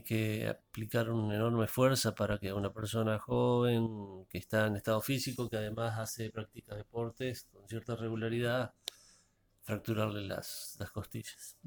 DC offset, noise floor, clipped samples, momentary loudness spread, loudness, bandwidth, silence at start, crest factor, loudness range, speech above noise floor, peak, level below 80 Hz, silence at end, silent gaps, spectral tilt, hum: under 0.1%; -70 dBFS; under 0.1%; 15 LU; -35 LUFS; over 20 kHz; 0.05 s; 20 dB; 7 LU; 35 dB; -16 dBFS; -62 dBFS; 0.15 s; none; -5.5 dB/octave; none